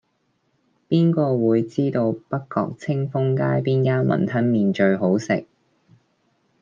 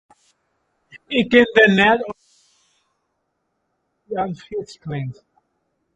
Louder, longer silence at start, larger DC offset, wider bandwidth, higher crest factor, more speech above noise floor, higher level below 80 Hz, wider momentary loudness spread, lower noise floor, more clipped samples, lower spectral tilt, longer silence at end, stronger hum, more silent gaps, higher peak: second, -21 LUFS vs -17 LUFS; second, 0.9 s vs 1.1 s; neither; second, 7.4 kHz vs 8.6 kHz; second, 16 dB vs 22 dB; second, 49 dB vs 55 dB; second, -66 dBFS vs -56 dBFS; second, 7 LU vs 19 LU; second, -69 dBFS vs -73 dBFS; neither; first, -8.5 dB/octave vs -6 dB/octave; first, 1.2 s vs 0.8 s; neither; neither; second, -6 dBFS vs 0 dBFS